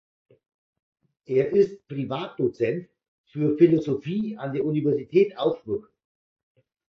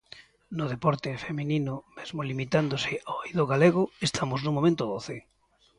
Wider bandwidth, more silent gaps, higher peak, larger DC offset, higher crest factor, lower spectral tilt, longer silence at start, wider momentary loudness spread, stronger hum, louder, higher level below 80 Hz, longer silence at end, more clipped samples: second, 6.4 kHz vs 11.5 kHz; first, 3.08-3.24 s vs none; about the same, -6 dBFS vs -8 dBFS; neither; about the same, 20 dB vs 20 dB; first, -9 dB/octave vs -6 dB/octave; first, 1.3 s vs 0.15 s; about the same, 12 LU vs 14 LU; neither; first, -25 LUFS vs -28 LUFS; second, -66 dBFS vs -60 dBFS; first, 1.15 s vs 0.6 s; neither